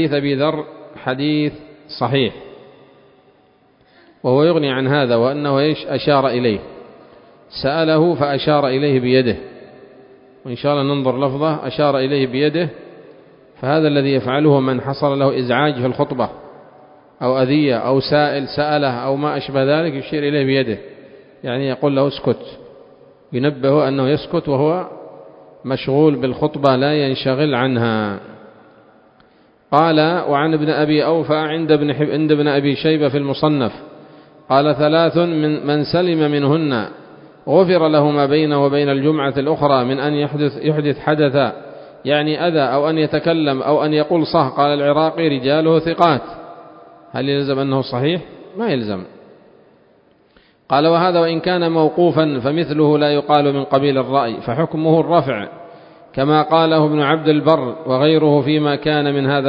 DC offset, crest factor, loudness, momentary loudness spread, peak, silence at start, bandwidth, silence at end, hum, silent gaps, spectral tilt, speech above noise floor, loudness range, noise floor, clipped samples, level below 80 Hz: under 0.1%; 16 dB; -16 LUFS; 9 LU; 0 dBFS; 0 s; 5.4 kHz; 0 s; none; none; -9.5 dB/octave; 38 dB; 4 LU; -54 dBFS; under 0.1%; -54 dBFS